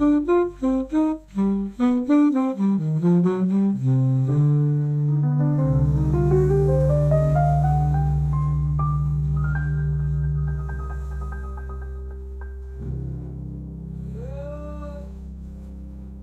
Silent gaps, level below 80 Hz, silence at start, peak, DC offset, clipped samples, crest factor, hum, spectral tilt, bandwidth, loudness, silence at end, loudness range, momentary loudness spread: none; -32 dBFS; 0 s; -8 dBFS; under 0.1%; under 0.1%; 14 dB; none; -10.5 dB/octave; 7.8 kHz; -21 LUFS; 0 s; 14 LU; 16 LU